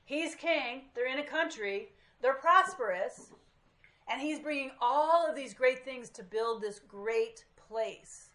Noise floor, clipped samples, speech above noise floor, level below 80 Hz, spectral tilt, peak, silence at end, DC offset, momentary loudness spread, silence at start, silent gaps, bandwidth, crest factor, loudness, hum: -65 dBFS; under 0.1%; 33 dB; -74 dBFS; -2.5 dB/octave; -10 dBFS; 0.1 s; under 0.1%; 14 LU; 0.1 s; none; 11.5 kHz; 22 dB; -32 LUFS; none